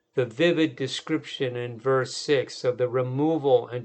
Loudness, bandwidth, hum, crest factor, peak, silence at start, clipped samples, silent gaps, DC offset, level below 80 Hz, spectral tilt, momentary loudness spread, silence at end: -25 LUFS; 9 kHz; none; 16 dB; -8 dBFS; 0.15 s; under 0.1%; none; under 0.1%; -76 dBFS; -5.5 dB/octave; 8 LU; 0 s